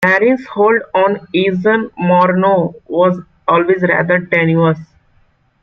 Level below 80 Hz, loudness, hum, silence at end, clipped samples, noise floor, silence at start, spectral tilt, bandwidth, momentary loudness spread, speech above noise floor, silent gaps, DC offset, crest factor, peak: -54 dBFS; -13 LUFS; none; 0.8 s; under 0.1%; -54 dBFS; 0 s; -8.5 dB/octave; 6.6 kHz; 4 LU; 41 dB; none; under 0.1%; 12 dB; 0 dBFS